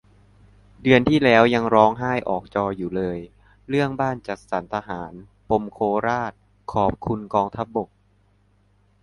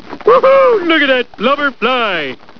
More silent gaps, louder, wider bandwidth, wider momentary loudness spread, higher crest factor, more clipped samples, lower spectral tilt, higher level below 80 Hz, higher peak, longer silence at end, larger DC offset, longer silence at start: neither; second, -22 LUFS vs -11 LUFS; first, 11 kHz vs 5.4 kHz; first, 15 LU vs 7 LU; first, 22 dB vs 12 dB; second, under 0.1% vs 0.1%; first, -7 dB/octave vs -5.5 dB/octave; first, -48 dBFS vs -54 dBFS; about the same, 0 dBFS vs 0 dBFS; first, 1.15 s vs 0.25 s; second, under 0.1% vs 2%; first, 0.8 s vs 0.05 s